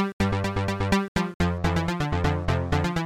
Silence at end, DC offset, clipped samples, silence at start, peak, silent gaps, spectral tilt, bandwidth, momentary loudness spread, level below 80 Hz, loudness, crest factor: 0 s; 0.1%; under 0.1%; 0 s; -10 dBFS; 0.13-0.20 s, 1.08-1.15 s, 1.34-1.40 s; -6.5 dB/octave; 15.5 kHz; 2 LU; -36 dBFS; -26 LUFS; 16 dB